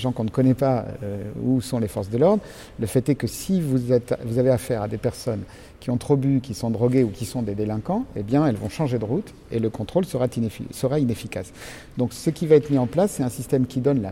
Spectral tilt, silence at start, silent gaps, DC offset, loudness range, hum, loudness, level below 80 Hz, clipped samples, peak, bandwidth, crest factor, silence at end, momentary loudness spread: -7.5 dB/octave; 0 s; none; under 0.1%; 2 LU; none; -23 LUFS; -48 dBFS; under 0.1%; -4 dBFS; 16.5 kHz; 18 dB; 0 s; 10 LU